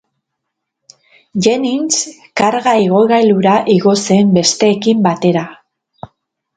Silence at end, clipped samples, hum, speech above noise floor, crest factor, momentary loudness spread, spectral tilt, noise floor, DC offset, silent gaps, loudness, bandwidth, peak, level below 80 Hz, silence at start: 1.05 s; under 0.1%; none; 64 dB; 14 dB; 6 LU; -4.5 dB/octave; -75 dBFS; under 0.1%; none; -12 LUFS; 9.4 kHz; 0 dBFS; -56 dBFS; 1.35 s